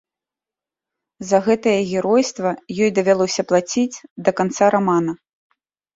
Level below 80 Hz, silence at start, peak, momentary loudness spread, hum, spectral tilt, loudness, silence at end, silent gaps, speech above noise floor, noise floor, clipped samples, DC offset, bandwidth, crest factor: -62 dBFS; 1.2 s; -2 dBFS; 8 LU; none; -5 dB/octave; -19 LUFS; 0.8 s; 4.11-4.16 s; 71 dB; -89 dBFS; under 0.1%; under 0.1%; 8 kHz; 18 dB